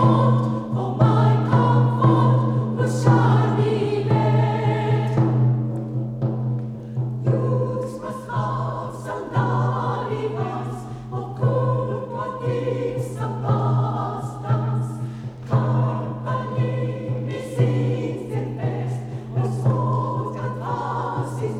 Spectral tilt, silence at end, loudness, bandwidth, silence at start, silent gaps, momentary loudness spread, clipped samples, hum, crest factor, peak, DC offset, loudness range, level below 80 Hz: -8.5 dB/octave; 0 s; -22 LUFS; 9.4 kHz; 0 s; none; 11 LU; under 0.1%; none; 18 dB; -4 dBFS; under 0.1%; 7 LU; -52 dBFS